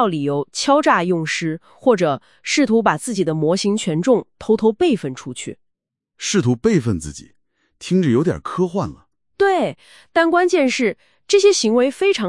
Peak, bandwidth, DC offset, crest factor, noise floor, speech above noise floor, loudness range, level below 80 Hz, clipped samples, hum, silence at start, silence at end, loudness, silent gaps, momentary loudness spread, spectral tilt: 0 dBFS; 12 kHz; 0.2%; 18 dB; -76 dBFS; 58 dB; 3 LU; -52 dBFS; under 0.1%; none; 0 s; 0 s; -18 LUFS; none; 12 LU; -5 dB/octave